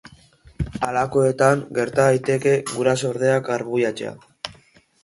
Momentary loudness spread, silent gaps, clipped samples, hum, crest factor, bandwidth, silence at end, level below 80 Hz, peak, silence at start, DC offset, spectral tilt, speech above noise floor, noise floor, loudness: 15 LU; none; under 0.1%; none; 18 dB; 11.5 kHz; 0.5 s; -46 dBFS; -4 dBFS; 0.6 s; under 0.1%; -5.5 dB/octave; 35 dB; -54 dBFS; -20 LUFS